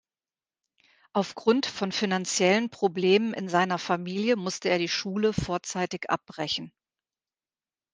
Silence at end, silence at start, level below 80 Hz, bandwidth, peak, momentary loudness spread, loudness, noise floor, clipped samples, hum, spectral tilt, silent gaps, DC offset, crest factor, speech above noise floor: 1.25 s; 1.15 s; -58 dBFS; 10 kHz; -8 dBFS; 8 LU; -27 LUFS; under -90 dBFS; under 0.1%; none; -4 dB/octave; none; under 0.1%; 20 dB; over 63 dB